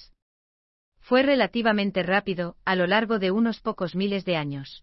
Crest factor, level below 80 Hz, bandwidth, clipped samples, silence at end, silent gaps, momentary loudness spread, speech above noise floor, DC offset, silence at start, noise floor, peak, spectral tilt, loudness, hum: 18 dB; -58 dBFS; 6 kHz; under 0.1%; 0.05 s; none; 7 LU; over 66 dB; under 0.1%; 1.1 s; under -90 dBFS; -8 dBFS; -8.5 dB/octave; -24 LUFS; none